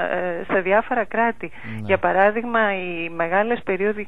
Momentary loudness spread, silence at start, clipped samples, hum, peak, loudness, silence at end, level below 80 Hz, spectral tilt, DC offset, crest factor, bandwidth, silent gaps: 8 LU; 0 s; under 0.1%; none; -4 dBFS; -21 LUFS; 0 s; -52 dBFS; -7.5 dB/octave; 2%; 18 dB; 4.6 kHz; none